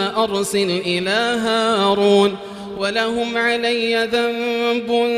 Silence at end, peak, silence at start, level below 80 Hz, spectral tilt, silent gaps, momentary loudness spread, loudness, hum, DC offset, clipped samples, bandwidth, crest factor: 0 s; -2 dBFS; 0 s; -56 dBFS; -4 dB/octave; none; 5 LU; -18 LUFS; none; under 0.1%; under 0.1%; 15.5 kHz; 16 dB